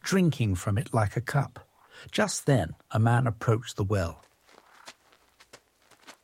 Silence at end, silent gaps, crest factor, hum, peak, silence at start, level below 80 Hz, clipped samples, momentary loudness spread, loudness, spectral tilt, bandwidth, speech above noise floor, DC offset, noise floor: 0.15 s; none; 18 dB; none; -10 dBFS; 0.05 s; -54 dBFS; under 0.1%; 7 LU; -28 LUFS; -6 dB/octave; 16 kHz; 35 dB; under 0.1%; -62 dBFS